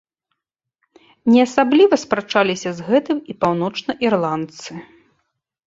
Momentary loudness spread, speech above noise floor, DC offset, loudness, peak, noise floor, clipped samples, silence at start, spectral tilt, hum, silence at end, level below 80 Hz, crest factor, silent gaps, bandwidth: 13 LU; 63 dB; under 0.1%; -18 LUFS; -2 dBFS; -80 dBFS; under 0.1%; 1.25 s; -5.5 dB/octave; none; 0.85 s; -62 dBFS; 18 dB; none; 7.8 kHz